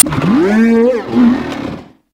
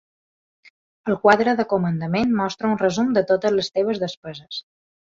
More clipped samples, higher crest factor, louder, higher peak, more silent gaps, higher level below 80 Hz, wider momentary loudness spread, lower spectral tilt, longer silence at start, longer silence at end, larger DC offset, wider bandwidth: first, 0.6% vs under 0.1%; second, 12 dB vs 20 dB; first, -11 LUFS vs -20 LUFS; about the same, 0 dBFS vs -2 dBFS; second, none vs 4.17-4.23 s; first, -40 dBFS vs -58 dBFS; about the same, 14 LU vs 15 LU; about the same, -5 dB/octave vs -6 dB/octave; second, 0.05 s vs 1.05 s; second, 0.3 s vs 0.55 s; neither; first, 16 kHz vs 7.6 kHz